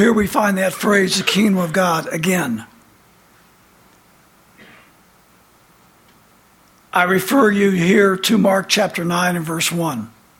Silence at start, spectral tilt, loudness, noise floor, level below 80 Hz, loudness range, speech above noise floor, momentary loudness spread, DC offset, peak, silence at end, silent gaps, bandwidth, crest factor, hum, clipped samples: 0 s; -4.5 dB/octave; -16 LUFS; -52 dBFS; -52 dBFS; 11 LU; 36 dB; 6 LU; under 0.1%; -2 dBFS; 0.3 s; none; 17 kHz; 18 dB; none; under 0.1%